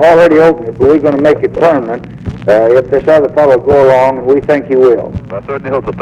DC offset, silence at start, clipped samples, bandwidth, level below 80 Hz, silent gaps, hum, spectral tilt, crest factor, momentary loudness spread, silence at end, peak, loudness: under 0.1%; 0 s; under 0.1%; 9.8 kHz; -36 dBFS; none; none; -7.5 dB/octave; 8 dB; 13 LU; 0 s; -2 dBFS; -9 LUFS